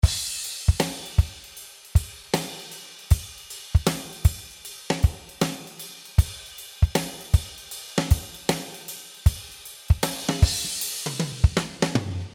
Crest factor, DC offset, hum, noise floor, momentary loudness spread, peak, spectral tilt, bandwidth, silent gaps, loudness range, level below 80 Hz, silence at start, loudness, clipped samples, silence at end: 22 dB; under 0.1%; none; -44 dBFS; 15 LU; -4 dBFS; -4.5 dB/octave; 18 kHz; none; 2 LU; -30 dBFS; 0.05 s; -26 LUFS; under 0.1%; 0 s